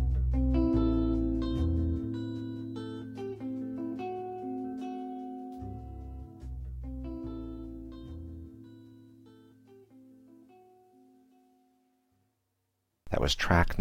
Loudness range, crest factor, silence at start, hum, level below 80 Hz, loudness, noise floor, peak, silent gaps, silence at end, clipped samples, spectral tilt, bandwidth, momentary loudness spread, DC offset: 19 LU; 22 dB; 0 s; none; -38 dBFS; -34 LUFS; -80 dBFS; -12 dBFS; none; 0 s; under 0.1%; -6.5 dB/octave; 14.5 kHz; 18 LU; under 0.1%